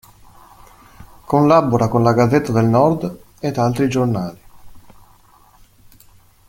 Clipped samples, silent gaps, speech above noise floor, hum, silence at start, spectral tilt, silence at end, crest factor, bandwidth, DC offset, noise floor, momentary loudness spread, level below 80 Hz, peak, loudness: under 0.1%; none; 34 dB; none; 1 s; -7.5 dB/octave; 1.7 s; 18 dB; 16.5 kHz; under 0.1%; -49 dBFS; 11 LU; -48 dBFS; -2 dBFS; -16 LUFS